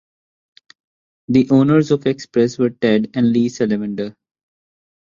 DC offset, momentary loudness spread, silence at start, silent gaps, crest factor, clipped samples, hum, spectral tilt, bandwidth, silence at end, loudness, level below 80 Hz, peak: under 0.1%; 9 LU; 1.3 s; none; 16 dB; under 0.1%; none; -7 dB/octave; 7.4 kHz; 0.95 s; -17 LUFS; -58 dBFS; -2 dBFS